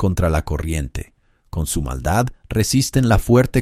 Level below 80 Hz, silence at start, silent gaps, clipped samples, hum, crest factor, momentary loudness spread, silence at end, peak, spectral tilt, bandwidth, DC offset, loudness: -28 dBFS; 0 s; none; under 0.1%; none; 16 dB; 11 LU; 0 s; -2 dBFS; -5.5 dB/octave; 16 kHz; under 0.1%; -19 LUFS